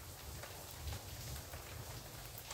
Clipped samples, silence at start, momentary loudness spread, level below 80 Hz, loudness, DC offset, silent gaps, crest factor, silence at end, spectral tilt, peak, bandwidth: under 0.1%; 0 s; 2 LU; -56 dBFS; -48 LUFS; under 0.1%; none; 18 dB; 0 s; -3 dB/octave; -32 dBFS; 18 kHz